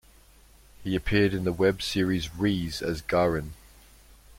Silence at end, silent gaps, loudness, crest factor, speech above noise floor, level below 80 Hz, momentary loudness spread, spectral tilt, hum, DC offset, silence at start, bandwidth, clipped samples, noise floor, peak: 0.85 s; none; -27 LUFS; 20 dB; 29 dB; -46 dBFS; 8 LU; -6 dB/octave; none; under 0.1%; 0.8 s; 16.5 kHz; under 0.1%; -55 dBFS; -8 dBFS